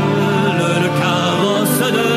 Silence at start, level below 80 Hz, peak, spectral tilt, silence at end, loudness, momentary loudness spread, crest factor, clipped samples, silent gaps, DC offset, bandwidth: 0 s; -58 dBFS; -2 dBFS; -5 dB/octave; 0 s; -15 LUFS; 1 LU; 12 dB; under 0.1%; none; under 0.1%; 15.5 kHz